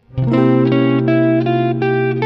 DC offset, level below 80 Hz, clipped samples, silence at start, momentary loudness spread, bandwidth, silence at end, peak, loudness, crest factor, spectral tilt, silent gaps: under 0.1%; -46 dBFS; under 0.1%; 0.15 s; 3 LU; 5.4 kHz; 0 s; -2 dBFS; -14 LUFS; 12 dB; -10 dB/octave; none